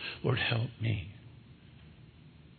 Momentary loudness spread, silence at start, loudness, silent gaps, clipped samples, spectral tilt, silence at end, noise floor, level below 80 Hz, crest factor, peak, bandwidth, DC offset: 25 LU; 0 s; -33 LUFS; none; under 0.1%; -9 dB/octave; 0.05 s; -55 dBFS; -62 dBFS; 22 dB; -14 dBFS; 4.5 kHz; under 0.1%